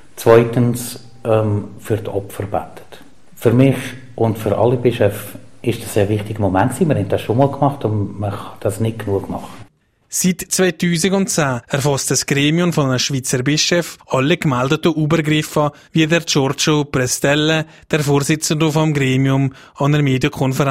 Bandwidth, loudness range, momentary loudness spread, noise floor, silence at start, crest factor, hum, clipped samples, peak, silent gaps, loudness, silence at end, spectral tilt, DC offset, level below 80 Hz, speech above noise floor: 16 kHz; 4 LU; 9 LU; -43 dBFS; 0.15 s; 16 dB; none; under 0.1%; 0 dBFS; none; -17 LUFS; 0 s; -5 dB/octave; under 0.1%; -48 dBFS; 27 dB